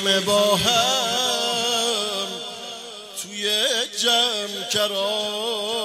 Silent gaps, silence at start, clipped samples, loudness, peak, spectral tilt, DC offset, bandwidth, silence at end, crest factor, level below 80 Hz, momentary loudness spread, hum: none; 0 s; under 0.1%; -20 LUFS; -6 dBFS; -1.5 dB/octave; under 0.1%; 16 kHz; 0 s; 18 dB; -60 dBFS; 14 LU; none